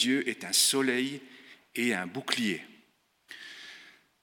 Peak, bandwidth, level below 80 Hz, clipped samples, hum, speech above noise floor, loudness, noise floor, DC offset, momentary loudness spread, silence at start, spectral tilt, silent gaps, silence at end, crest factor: -6 dBFS; 19 kHz; -84 dBFS; under 0.1%; none; 38 dB; -28 LUFS; -67 dBFS; under 0.1%; 22 LU; 0 s; -2 dB/octave; none; 0.3 s; 26 dB